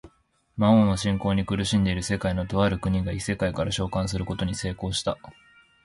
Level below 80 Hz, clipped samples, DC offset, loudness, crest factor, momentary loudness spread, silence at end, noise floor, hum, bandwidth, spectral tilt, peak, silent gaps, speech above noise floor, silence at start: -42 dBFS; under 0.1%; under 0.1%; -25 LUFS; 18 dB; 9 LU; 0.55 s; -64 dBFS; none; 11.5 kHz; -5.5 dB/octave; -8 dBFS; none; 40 dB; 0.05 s